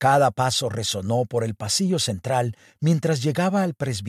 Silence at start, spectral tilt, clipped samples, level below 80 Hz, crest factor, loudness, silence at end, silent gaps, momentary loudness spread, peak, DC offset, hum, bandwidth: 0 s; -4.5 dB/octave; under 0.1%; -60 dBFS; 16 dB; -23 LUFS; 0 s; none; 6 LU; -6 dBFS; under 0.1%; none; 15 kHz